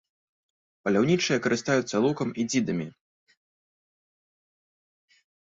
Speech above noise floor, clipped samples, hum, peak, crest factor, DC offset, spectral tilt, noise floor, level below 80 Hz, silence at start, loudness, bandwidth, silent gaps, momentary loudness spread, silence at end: over 65 dB; under 0.1%; none; -10 dBFS; 20 dB; under 0.1%; -5 dB/octave; under -90 dBFS; -68 dBFS; 0.85 s; -26 LUFS; 8 kHz; none; 9 LU; 2.7 s